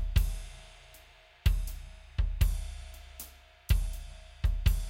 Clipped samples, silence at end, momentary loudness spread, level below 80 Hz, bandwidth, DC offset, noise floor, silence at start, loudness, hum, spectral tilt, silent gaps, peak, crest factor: under 0.1%; 0 s; 20 LU; -32 dBFS; 17 kHz; under 0.1%; -57 dBFS; 0 s; -34 LUFS; none; -5 dB/octave; none; -14 dBFS; 18 dB